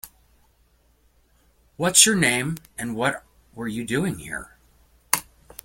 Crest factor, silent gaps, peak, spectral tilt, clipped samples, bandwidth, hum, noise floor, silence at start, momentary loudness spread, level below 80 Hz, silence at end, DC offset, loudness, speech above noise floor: 26 dB; none; 0 dBFS; -2.5 dB/octave; under 0.1%; 17 kHz; none; -61 dBFS; 0.05 s; 20 LU; -54 dBFS; 0.45 s; under 0.1%; -21 LUFS; 39 dB